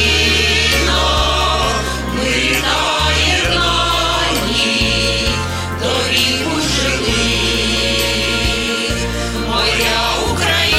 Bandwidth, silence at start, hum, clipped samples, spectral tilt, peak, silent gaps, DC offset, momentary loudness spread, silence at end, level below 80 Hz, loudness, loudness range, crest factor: 16.5 kHz; 0 s; none; under 0.1%; -3 dB/octave; -2 dBFS; none; under 0.1%; 5 LU; 0 s; -24 dBFS; -14 LUFS; 1 LU; 14 dB